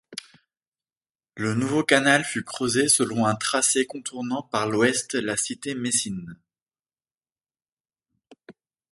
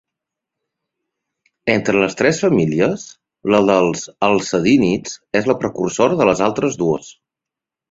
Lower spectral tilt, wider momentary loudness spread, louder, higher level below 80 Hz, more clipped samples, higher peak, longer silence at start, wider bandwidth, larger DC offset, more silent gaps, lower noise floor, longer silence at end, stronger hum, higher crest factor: second, -3 dB/octave vs -5.5 dB/octave; first, 12 LU vs 8 LU; second, -23 LUFS vs -17 LUFS; second, -66 dBFS vs -52 dBFS; neither; about the same, -2 dBFS vs -2 dBFS; second, 0.1 s vs 1.65 s; first, 12 kHz vs 8 kHz; neither; first, 0.68-0.72 s, 0.97-1.01 s, 7.72-7.77 s vs none; first, under -90 dBFS vs -86 dBFS; second, 0.4 s vs 0.8 s; neither; first, 24 dB vs 16 dB